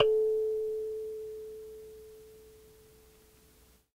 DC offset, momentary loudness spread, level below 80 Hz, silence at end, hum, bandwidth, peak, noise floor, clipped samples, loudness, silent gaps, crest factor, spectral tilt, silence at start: under 0.1%; 25 LU; -64 dBFS; 1.4 s; none; 16 kHz; -10 dBFS; -62 dBFS; under 0.1%; -33 LUFS; none; 24 dB; -4 dB/octave; 0 s